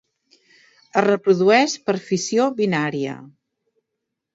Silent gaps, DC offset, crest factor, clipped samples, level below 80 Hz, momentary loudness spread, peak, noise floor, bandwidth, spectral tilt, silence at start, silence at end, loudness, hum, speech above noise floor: none; under 0.1%; 20 dB; under 0.1%; -70 dBFS; 11 LU; 0 dBFS; -80 dBFS; 8 kHz; -4.5 dB/octave; 0.95 s; 1.1 s; -19 LUFS; none; 61 dB